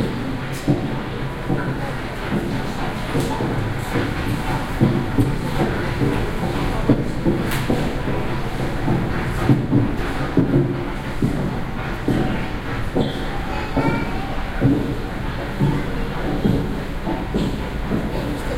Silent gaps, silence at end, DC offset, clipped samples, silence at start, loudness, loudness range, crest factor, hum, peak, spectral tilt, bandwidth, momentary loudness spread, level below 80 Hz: none; 0 s; under 0.1%; under 0.1%; 0 s; -22 LUFS; 3 LU; 20 dB; none; -2 dBFS; -7 dB/octave; 16 kHz; 7 LU; -28 dBFS